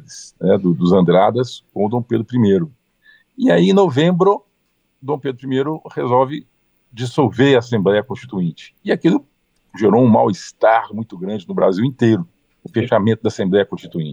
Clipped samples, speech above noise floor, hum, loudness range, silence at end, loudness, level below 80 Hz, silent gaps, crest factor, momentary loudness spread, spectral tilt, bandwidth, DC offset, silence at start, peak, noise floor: under 0.1%; 50 dB; none; 2 LU; 0 s; -17 LUFS; -62 dBFS; none; 16 dB; 12 LU; -7.5 dB/octave; 9.6 kHz; under 0.1%; 0.1 s; -2 dBFS; -66 dBFS